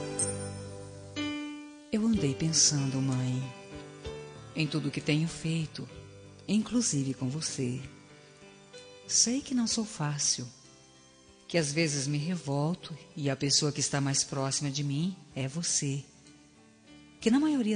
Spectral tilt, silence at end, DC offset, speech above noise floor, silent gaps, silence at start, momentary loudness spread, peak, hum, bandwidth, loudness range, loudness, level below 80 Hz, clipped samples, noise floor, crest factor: -4 dB/octave; 0 s; under 0.1%; 28 dB; none; 0 s; 18 LU; -10 dBFS; none; 10 kHz; 4 LU; -30 LUFS; -62 dBFS; under 0.1%; -58 dBFS; 22 dB